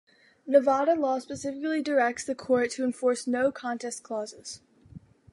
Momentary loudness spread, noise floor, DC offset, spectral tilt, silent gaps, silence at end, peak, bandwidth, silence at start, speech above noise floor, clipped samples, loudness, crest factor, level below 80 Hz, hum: 14 LU; -51 dBFS; under 0.1%; -4 dB/octave; none; 0.35 s; -8 dBFS; 11.5 kHz; 0.45 s; 24 dB; under 0.1%; -27 LUFS; 20 dB; -68 dBFS; none